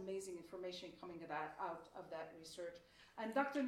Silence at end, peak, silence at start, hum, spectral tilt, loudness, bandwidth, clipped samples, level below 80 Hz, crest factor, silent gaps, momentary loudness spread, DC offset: 0 s; -26 dBFS; 0 s; none; -4.5 dB/octave; -48 LUFS; 16 kHz; under 0.1%; -80 dBFS; 22 dB; none; 11 LU; under 0.1%